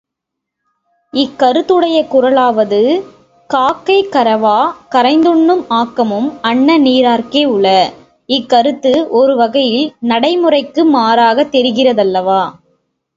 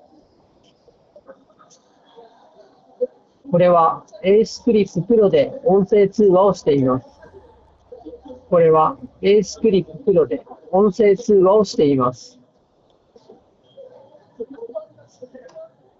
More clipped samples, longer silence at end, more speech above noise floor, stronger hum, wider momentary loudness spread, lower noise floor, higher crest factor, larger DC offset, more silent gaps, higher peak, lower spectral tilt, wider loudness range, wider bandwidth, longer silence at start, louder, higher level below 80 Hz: neither; first, 0.65 s vs 0.35 s; first, 67 dB vs 43 dB; neither; second, 6 LU vs 18 LU; first, -78 dBFS vs -58 dBFS; about the same, 12 dB vs 14 dB; neither; neither; first, 0 dBFS vs -4 dBFS; second, -5.5 dB/octave vs -7 dB/octave; second, 1 LU vs 7 LU; about the same, 7.8 kHz vs 7.6 kHz; second, 1.15 s vs 3 s; first, -11 LUFS vs -17 LUFS; about the same, -56 dBFS vs -54 dBFS